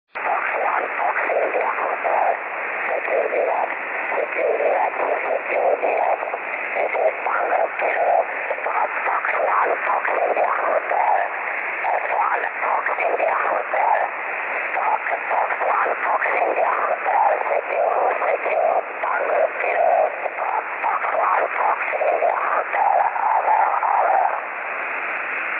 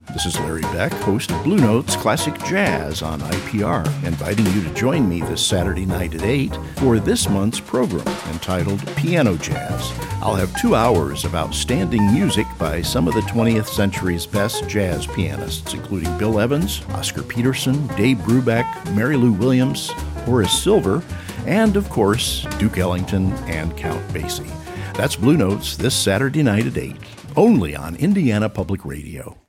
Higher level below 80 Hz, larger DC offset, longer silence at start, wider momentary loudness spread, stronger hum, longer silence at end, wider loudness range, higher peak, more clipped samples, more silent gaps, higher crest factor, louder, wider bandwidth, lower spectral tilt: second, -76 dBFS vs -38 dBFS; neither; about the same, 0.15 s vs 0.05 s; second, 5 LU vs 9 LU; neither; second, 0 s vs 0.15 s; about the same, 2 LU vs 3 LU; second, -6 dBFS vs -2 dBFS; neither; neither; about the same, 14 dB vs 16 dB; about the same, -21 LUFS vs -19 LUFS; second, 4.2 kHz vs 16.5 kHz; about the same, -6 dB/octave vs -5.5 dB/octave